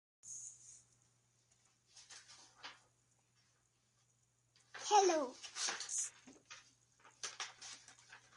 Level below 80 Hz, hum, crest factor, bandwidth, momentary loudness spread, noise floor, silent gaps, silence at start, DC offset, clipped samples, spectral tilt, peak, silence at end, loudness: -90 dBFS; none; 26 dB; 11.5 kHz; 25 LU; -78 dBFS; none; 0.25 s; under 0.1%; under 0.1%; -0.5 dB/octave; -20 dBFS; 0.2 s; -39 LUFS